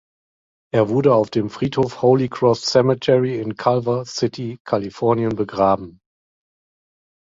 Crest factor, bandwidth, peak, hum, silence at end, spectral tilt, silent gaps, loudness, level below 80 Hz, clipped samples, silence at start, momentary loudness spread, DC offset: 20 dB; 7.8 kHz; 0 dBFS; none; 1.45 s; -6.5 dB/octave; 4.60-4.65 s; -19 LUFS; -54 dBFS; under 0.1%; 0.75 s; 7 LU; under 0.1%